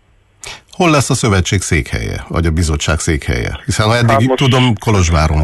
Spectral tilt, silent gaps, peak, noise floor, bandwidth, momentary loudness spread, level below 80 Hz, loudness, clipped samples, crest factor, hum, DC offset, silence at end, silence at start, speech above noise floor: -5 dB/octave; none; -2 dBFS; -35 dBFS; 12.5 kHz; 9 LU; -22 dBFS; -13 LUFS; under 0.1%; 12 dB; none; under 0.1%; 0 s; 0.45 s; 23 dB